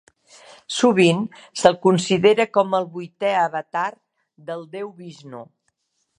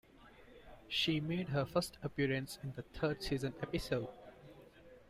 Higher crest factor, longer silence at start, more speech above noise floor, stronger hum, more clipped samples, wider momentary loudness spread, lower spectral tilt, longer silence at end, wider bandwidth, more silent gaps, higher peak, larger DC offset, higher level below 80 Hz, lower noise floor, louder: about the same, 22 dB vs 20 dB; first, 0.7 s vs 0.2 s; first, 51 dB vs 22 dB; neither; neither; about the same, 22 LU vs 23 LU; about the same, -5 dB/octave vs -5.5 dB/octave; first, 0.75 s vs 0.05 s; second, 11 kHz vs 15.5 kHz; neither; first, 0 dBFS vs -20 dBFS; neither; second, -64 dBFS vs -58 dBFS; first, -71 dBFS vs -60 dBFS; first, -19 LUFS vs -38 LUFS